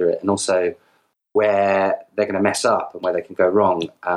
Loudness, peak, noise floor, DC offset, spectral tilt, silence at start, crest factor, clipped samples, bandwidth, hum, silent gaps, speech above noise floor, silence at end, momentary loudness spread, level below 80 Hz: -20 LUFS; -4 dBFS; -63 dBFS; under 0.1%; -4.5 dB/octave; 0 s; 16 dB; under 0.1%; 12.5 kHz; none; none; 44 dB; 0 s; 7 LU; -66 dBFS